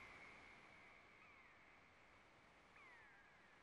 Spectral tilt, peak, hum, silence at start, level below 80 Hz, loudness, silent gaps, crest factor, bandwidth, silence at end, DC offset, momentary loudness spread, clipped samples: -3.5 dB/octave; -50 dBFS; none; 0 s; -84 dBFS; -65 LUFS; none; 16 dB; 11 kHz; 0 s; under 0.1%; 8 LU; under 0.1%